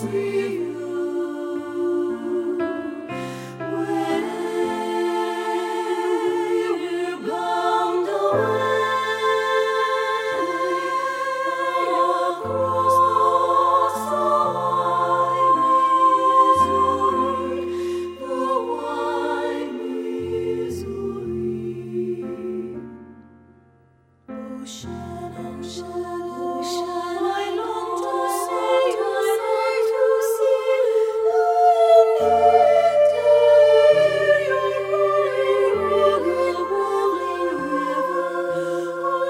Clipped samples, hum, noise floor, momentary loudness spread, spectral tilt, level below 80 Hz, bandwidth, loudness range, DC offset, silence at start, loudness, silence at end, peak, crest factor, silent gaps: under 0.1%; none; -57 dBFS; 13 LU; -5 dB/octave; -60 dBFS; 16 kHz; 13 LU; under 0.1%; 0 s; -21 LUFS; 0 s; -4 dBFS; 18 dB; none